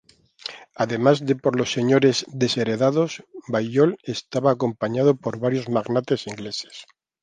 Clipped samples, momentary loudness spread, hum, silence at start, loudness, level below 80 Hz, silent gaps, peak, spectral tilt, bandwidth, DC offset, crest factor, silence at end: under 0.1%; 14 LU; none; 0.45 s; -22 LUFS; -64 dBFS; none; -4 dBFS; -5.5 dB/octave; 9.6 kHz; under 0.1%; 18 dB; 0.4 s